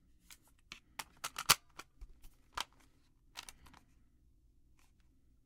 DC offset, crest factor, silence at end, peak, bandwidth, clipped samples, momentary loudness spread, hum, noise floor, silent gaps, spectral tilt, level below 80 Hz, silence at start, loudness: under 0.1%; 38 dB; 1.75 s; -6 dBFS; 17 kHz; under 0.1%; 25 LU; none; -68 dBFS; none; 0.5 dB/octave; -64 dBFS; 0.3 s; -36 LUFS